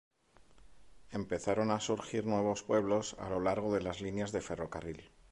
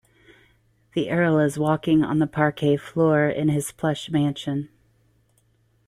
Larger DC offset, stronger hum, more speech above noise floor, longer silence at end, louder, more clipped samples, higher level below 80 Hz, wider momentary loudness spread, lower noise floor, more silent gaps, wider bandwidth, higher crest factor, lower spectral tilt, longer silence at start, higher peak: neither; neither; second, 28 dB vs 42 dB; second, 0.25 s vs 1.2 s; second, -35 LUFS vs -22 LUFS; neither; about the same, -60 dBFS vs -58 dBFS; about the same, 11 LU vs 9 LU; about the same, -63 dBFS vs -64 dBFS; neither; second, 11.5 kHz vs 13 kHz; about the same, 18 dB vs 18 dB; about the same, -5.5 dB/octave vs -6.5 dB/octave; second, 0.65 s vs 0.95 s; second, -18 dBFS vs -6 dBFS